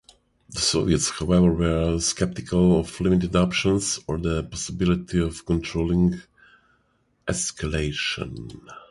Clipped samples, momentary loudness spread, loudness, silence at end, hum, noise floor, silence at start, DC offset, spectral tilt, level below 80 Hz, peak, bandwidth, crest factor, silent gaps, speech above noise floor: under 0.1%; 11 LU; -23 LUFS; 0.05 s; none; -67 dBFS; 0.5 s; under 0.1%; -5 dB/octave; -38 dBFS; -6 dBFS; 11.5 kHz; 18 dB; none; 44 dB